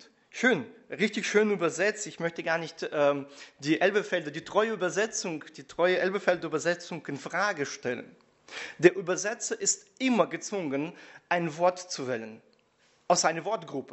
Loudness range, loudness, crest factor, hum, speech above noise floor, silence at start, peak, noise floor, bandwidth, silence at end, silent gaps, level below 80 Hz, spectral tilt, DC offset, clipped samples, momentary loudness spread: 2 LU; -29 LUFS; 26 dB; none; 37 dB; 0.35 s; -4 dBFS; -66 dBFS; 8.2 kHz; 0.1 s; none; -76 dBFS; -3.5 dB/octave; under 0.1%; under 0.1%; 12 LU